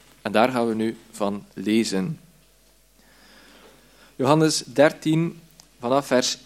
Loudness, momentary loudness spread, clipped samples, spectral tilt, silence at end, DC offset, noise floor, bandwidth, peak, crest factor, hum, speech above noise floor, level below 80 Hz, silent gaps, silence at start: -23 LUFS; 11 LU; under 0.1%; -5 dB/octave; 0.1 s; under 0.1%; -58 dBFS; 16 kHz; -2 dBFS; 22 dB; none; 36 dB; -62 dBFS; none; 0.25 s